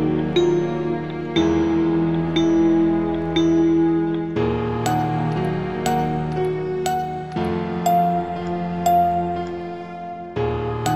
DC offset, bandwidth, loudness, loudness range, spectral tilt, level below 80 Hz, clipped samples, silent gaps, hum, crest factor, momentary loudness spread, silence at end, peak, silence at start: 0.5%; 14.5 kHz; -21 LUFS; 4 LU; -6.5 dB/octave; -44 dBFS; under 0.1%; none; none; 14 dB; 8 LU; 0 s; -6 dBFS; 0 s